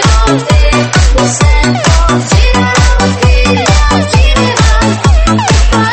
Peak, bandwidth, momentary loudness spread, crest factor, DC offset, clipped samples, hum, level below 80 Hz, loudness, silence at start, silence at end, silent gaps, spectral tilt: 0 dBFS; 8.8 kHz; 1 LU; 6 dB; under 0.1%; 0.5%; none; -10 dBFS; -8 LUFS; 0 s; 0 s; none; -4.5 dB/octave